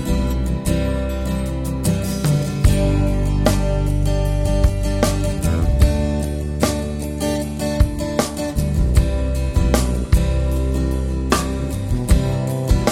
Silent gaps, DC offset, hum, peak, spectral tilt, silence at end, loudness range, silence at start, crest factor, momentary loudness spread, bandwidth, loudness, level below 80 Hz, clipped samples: none; under 0.1%; none; -2 dBFS; -6 dB/octave; 0 s; 2 LU; 0 s; 16 dB; 5 LU; 16 kHz; -20 LUFS; -20 dBFS; under 0.1%